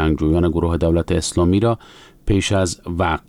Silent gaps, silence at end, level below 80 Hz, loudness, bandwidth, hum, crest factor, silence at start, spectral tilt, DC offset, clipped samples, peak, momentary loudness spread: none; 0.1 s; -30 dBFS; -19 LUFS; 12 kHz; none; 12 dB; 0 s; -6 dB/octave; under 0.1%; under 0.1%; -6 dBFS; 5 LU